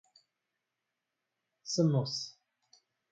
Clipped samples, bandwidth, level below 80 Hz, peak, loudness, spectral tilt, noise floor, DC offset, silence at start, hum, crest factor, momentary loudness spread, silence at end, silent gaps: under 0.1%; 9 kHz; -82 dBFS; -18 dBFS; -32 LUFS; -6 dB/octave; -87 dBFS; under 0.1%; 1.65 s; none; 20 dB; 16 LU; 0.8 s; none